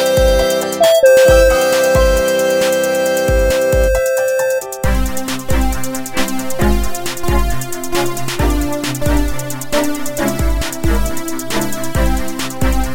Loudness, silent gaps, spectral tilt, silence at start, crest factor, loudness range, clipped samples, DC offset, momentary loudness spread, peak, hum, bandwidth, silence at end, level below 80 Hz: -15 LUFS; none; -4.5 dB/octave; 0 s; 14 dB; 7 LU; under 0.1%; under 0.1%; 10 LU; 0 dBFS; none; 16.5 kHz; 0 s; -20 dBFS